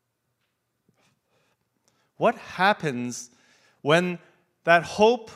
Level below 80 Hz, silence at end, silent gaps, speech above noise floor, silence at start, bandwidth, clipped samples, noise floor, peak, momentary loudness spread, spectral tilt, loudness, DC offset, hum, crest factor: -68 dBFS; 0.05 s; none; 54 dB; 2.2 s; 15 kHz; under 0.1%; -76 dBFS; -2 dBFS; 14 LU; -4.5 dB/octave; -23 LUFS; under 0.1%; none; 24 dB